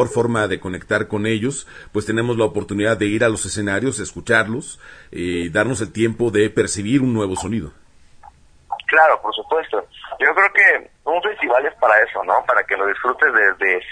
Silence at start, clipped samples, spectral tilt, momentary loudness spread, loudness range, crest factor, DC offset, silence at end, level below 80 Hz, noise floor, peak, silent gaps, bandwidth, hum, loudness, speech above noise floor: 0 s; under 0.1%; -4.5 dB/octave; 12 LU; 5 LU; 18 dB; under 0.1%; 0 s; -48 dBFS; -46 dBFS; 0 dBFS; none; 10.5 kHz; none; -18 LUFS; 28 dB